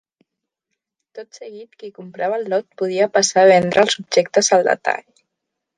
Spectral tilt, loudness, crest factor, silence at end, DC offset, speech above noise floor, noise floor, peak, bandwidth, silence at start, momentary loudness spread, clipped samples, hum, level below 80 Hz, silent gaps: -3 dB/octave; -17 LUFS; 18 dB; 0.8 s; under 0.1%; 63 dB; -80 dBFS; -2 dBFS; 10 kHz; 1.15 s; 24 LU; under 0.1%; none; -66 dBFS; none